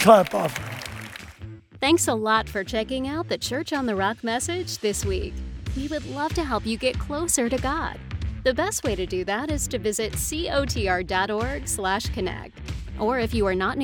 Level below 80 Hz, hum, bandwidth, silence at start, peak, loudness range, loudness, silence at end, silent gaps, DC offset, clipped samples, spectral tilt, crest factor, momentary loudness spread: -38 dBFS; none; 19 kHz; 0 s; -2 dBFS; 2 LU; -25 LUFS; 0 s; none; under 0.1%; under 0.1%; -4 dB/octave; 22 dB; 12 LU